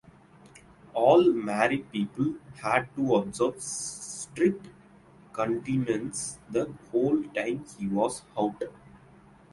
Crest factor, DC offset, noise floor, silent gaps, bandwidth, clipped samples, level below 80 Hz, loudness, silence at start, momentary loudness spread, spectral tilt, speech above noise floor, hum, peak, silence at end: 20 dB; under 0.1%; -55 dBFS; none; 11.5 kHz; under 0.1%; -62 dBFS; -28 LUFS; 0.45 s; 11 LU; -5 dB/octave; 27 dB; none; -8 dBFS; 0.55 s